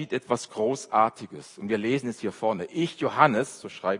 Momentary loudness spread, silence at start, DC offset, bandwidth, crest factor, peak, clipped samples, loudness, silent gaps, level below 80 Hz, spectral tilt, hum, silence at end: 12 LU; 0 s; under 0.1%; 11 kHz; 24 dB; -4 dBFS; under 0.1%; -26 LUFS; none; -74 dBFS; -5 dB/octave; none; 0 s